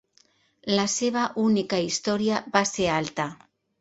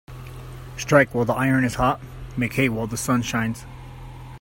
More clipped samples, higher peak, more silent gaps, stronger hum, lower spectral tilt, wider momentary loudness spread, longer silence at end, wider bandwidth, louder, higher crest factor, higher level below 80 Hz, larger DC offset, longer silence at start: neither; about the same, -4 dBFS vs -2 dBFS; neither; neither; second, -3.5 dB/octave vs -5.5 dB/octave; second, 7 LU vs 22 LU; first, 0.45 s vs 0 s; second, 8.2 kHz vs 16.5 kHz; second, -25 LUFS vs -22 LUFS; about the same, 22 dB vs 22 dB; second, -60 dBFS vs -42 dBFS; neither; first, 0.65 s vs 0.1 s